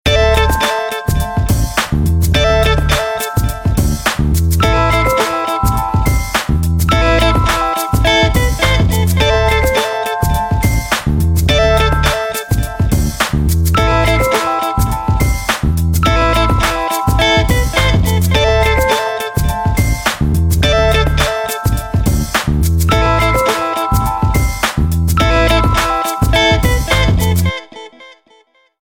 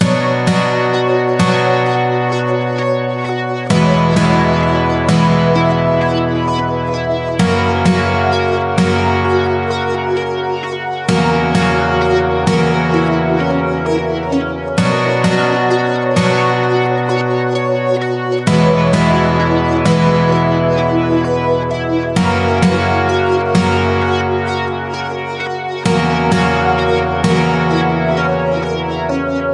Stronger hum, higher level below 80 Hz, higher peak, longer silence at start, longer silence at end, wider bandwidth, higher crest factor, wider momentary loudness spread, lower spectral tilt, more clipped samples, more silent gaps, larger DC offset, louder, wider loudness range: neither; first, -18 dBFS vs -40 dBFS; about the same, 0 dBFS vs 0 dBFS; about the same, 0.05 s vs 0 s; first, 0.75 s vs 0 s; first, 18 kHz vs 11.5 kHz; about the same, 12 dB vs 14 dB; about the same, 5 LU vs 6 LU; second, -5 dB/octave vs -6.5 dB/octave; neither; neither; neither; about the same, -13 LUFS vs -14 LUFS; about the same, 2 LU vs 2 LU